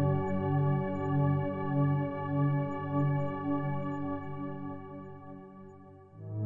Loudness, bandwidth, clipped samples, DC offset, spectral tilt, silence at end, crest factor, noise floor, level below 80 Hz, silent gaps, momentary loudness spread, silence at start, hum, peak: -32 LUFS; 3.6 kHz; under 0.1%; under 0.1%; -11 dB/octave; 0 s; 14 dB; -52 dBFS; -66 dBFS; none; 18 LU; 0 s; none; -18 dBFS